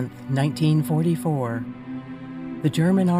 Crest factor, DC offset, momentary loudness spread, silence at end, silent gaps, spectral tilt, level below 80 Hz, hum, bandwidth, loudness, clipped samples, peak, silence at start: 16 dB; under 0.1%; 15 LU; 0 s; none; -7.5 dB/octave; -60 dBFS; none; 15.5 kHz; -23 LUFS; under 0.1%; -8 dBFS; 0 s